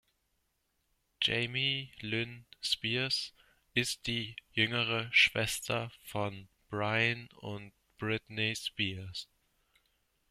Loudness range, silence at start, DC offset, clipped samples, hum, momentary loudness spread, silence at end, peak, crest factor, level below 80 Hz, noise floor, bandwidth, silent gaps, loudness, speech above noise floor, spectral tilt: 5 LU; 1.2 s; under 0.1%; under 0.1%; none; 16 LU; 1.05 s; -12 dBFS; 24 dB; -64 dBFS; -79 dBFS; 15.5 kHz; none; -32 LUFS; 45 dB; -3.5 dB/octave